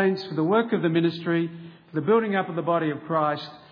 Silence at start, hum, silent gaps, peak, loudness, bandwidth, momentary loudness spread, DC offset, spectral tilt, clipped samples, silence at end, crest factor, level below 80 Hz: 0 s; none; none; -8 dBFS; -25 LUFS; 5.4 kHz; 10 LU; under 0.1%; -9 dB/octave; under 0.1%; 0.15 s; 16 dB; -74 dBFS